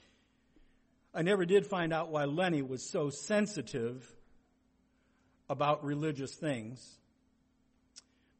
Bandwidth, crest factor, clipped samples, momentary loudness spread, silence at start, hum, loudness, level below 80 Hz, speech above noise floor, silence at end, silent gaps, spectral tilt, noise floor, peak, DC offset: 8.8 kHz; 20 dB; under 0.1%; 12 LU; 1.15 s; none; -34 LUFS; -70 dBFS; 39 dB; 0.4 s; none; -5.5 dB/octave; -72 dBFS; -16 dBFS; under 0.1%